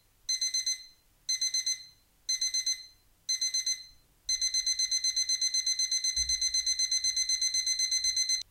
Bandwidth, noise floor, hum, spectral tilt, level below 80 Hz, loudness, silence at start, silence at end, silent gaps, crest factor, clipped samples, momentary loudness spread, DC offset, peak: 16.5 kHz; -55 dBFS; none; 5 dB/octave; -60 dBFS; -28 LUFS; 0.3 s; 0.1 s; none; 12 dB; under 0.1%; 8 LU; under 0.1%; -18 dBFS